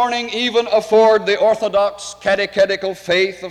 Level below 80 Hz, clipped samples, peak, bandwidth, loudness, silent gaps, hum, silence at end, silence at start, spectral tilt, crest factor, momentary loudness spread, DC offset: -54 dBFS; under 0.1%; -4 dBFS; 12.5 kHz; -16 LUFS; none; none; 0 s; 0 s; -3.5 dB/octave; 12 dB; 7 LU; under 0.1%